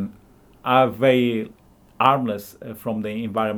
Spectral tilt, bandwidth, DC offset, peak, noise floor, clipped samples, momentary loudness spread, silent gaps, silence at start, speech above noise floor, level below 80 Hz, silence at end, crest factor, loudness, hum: -6.5 dB/octave; over 20 kHz; under 0.1%; 0 dBFS; -51 dBFS; under 0.1%; 15 LU; none; 0 s; 31 dB; -58 dBFS; 0 s; 22 dB; -21 LUFS; none